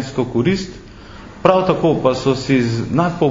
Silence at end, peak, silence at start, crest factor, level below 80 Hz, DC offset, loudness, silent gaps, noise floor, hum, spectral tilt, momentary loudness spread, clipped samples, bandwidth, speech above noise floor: 0 s; 0 dBFS; 0 s; 16 dB; -42 dBFS; under 0.1%; -17 LUFS; none; -36 dBFS; none; -7 dB/octave; 18 LU; under 0.1%; 7.6 kHz; 21 dB